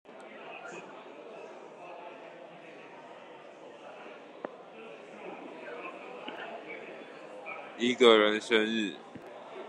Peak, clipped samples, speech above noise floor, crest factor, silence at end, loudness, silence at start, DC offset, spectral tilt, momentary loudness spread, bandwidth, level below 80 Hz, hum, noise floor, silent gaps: -8 dBFS; under 0.1%; 24 dB; 26 dB; 0 s; -29 LUFS; 0.1 s; under 0.1%; -3.5 dB/octave; 23 LU; 10.5 kHz; -86 dBFS; none; -50 dBFS; none